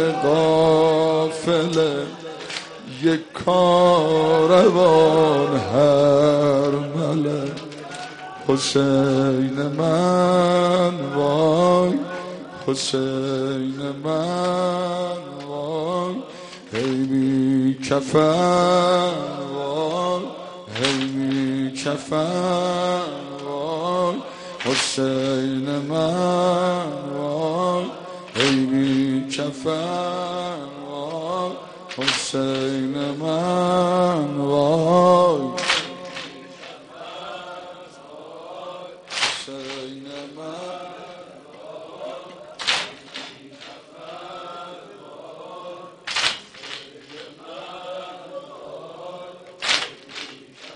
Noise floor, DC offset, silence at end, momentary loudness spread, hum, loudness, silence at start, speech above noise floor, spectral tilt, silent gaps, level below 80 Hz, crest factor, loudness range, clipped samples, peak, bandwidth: -42 dBFS; under 0.1%; 0 s; 21 LU; none; -20 LUFS; 0 s; 23 dB; -5 dB/octave; none; -60 dBFS; 20 dB; 13 LU; under 0.1%; -2 dBFS; 10.5 kHz